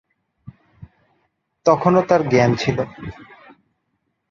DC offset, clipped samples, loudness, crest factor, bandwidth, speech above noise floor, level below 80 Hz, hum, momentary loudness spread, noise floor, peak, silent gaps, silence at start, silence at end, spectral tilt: under 0.1%; under 0.1%; -18 LUFS; 20 dB; 7.4 kHz; 55 dB; -52 dBFS; none; 16 LU; -72 dBFS; -2 dBFS; none; 0.45 s; 1.05 s; -6.5 dB/octave